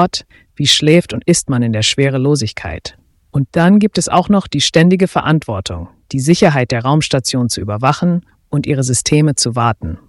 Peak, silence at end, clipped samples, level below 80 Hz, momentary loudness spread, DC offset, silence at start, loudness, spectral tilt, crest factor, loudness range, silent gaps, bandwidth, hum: 0 dBFS; 0.1 s; under 0.1%; -40 dBFS; 11 LU; under 0.1%; 0 s; -14 LUFS; -5 dB/octave; 14 dB; 2 LU; none; 12 kHz; none